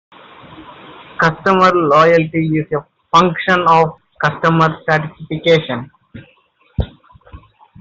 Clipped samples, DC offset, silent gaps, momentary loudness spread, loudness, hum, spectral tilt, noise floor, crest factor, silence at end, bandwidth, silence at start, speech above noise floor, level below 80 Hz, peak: under 0.1%; under 0.1%; none; 14 LU; -14 LUFS; none; -6.5 dB/octave; -54 dBFS; 14 dB; 0.45 s; 7.6 kHz; 0.5 s; 41 dB; -40 dBFS; -2 dBFS